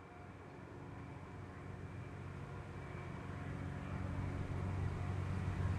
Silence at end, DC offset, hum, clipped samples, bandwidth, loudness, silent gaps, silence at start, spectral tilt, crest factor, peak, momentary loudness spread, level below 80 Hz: 0 s; under 0.1%; none; under 0.1%; 9.8 kHz; -46 LUFS; none; 0 s; -7.5 dB/octave; 16 dB; -28 dBFS; 11 LU; -56 dBFS